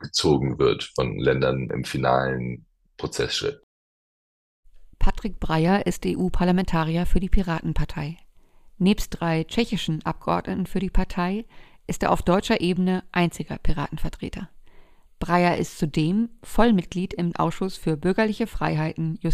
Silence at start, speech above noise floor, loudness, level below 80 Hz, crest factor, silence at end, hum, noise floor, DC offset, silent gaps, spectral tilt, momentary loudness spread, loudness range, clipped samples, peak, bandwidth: 0 s; 28 dB; -24 LUFS; -32 dBFS; 18 dB; 0 s; none; -51 dBFS; under 0.1%; 3.63-4.63 s; -6 dB/octave; 11 LU; 3 LU; under 0.1%; -4 dBFS; 15 kHz